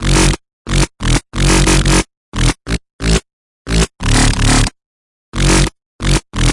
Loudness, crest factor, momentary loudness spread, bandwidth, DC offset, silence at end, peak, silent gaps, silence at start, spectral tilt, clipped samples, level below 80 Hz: -15 LUFS; 12 dB; 10 LU; 11.5 kHz; under 0.1%; 0 s; 0 dBFS; 0.53-0.65 s, 2.17-2.32 s, 2.93-2.99 s, 3.33-3.65 s, 4.86-5.32 s, 5.86-5.99 s; 0 s; -4 dB/octave; under 0.1%; -18 dBFS